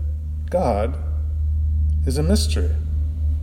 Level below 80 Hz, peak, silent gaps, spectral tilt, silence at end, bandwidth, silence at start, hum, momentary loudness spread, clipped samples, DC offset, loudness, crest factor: -22 dBFS; -6 dBFS; none; -6.5 dB/octave; 0 s; 12.5 kHz; 0 s; none; 6 LU; under 0.1%; under 0.1%; -22 LUFS; 14 dB